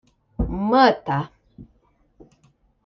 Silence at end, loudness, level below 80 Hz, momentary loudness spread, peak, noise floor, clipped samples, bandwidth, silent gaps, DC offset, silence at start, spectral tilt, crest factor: 1.2 s; -20 LUFS; -38 dBFS; 19 LU; -4 dBFS; -62 dBFS; under 0.1%; 6.2 kHz; none; under 0.1%; 0.4 s; -7.5 dB/octave; 20 dB